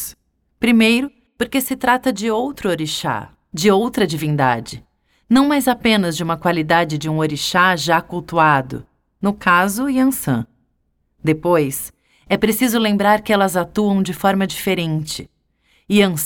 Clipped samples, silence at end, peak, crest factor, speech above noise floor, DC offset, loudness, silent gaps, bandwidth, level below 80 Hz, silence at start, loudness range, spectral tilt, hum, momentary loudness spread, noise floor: under 0.1%; 0 s; -2 dBFS; 16 dB; 49 dB; under 0.1%; -17 LUFS; none; 17.5 kHz; -48 dBFS; 0 s; 2 LU; -5 dB/octave; none; 10 LU; -66 dBFS